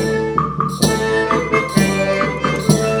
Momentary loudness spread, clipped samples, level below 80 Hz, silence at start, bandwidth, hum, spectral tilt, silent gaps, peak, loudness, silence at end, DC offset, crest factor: 3 LU; under 0.1%; -38 dBFS; 0 s; over 20 kHz; none; -5 dB/octave; none; 0 dBFS; -17 LUFS; 0 s; under 0.1%; 16 dB